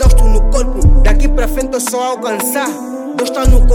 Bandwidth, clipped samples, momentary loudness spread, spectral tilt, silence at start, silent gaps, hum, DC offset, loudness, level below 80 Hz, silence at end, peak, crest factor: 17.5 kHz; under 0.1%; 7 LU; -5.5 dB/octave; 0 s; none; none; under 0.1%; -15 LUFS; -10 dBFS; 0 s; 0 dBFS; 10 dB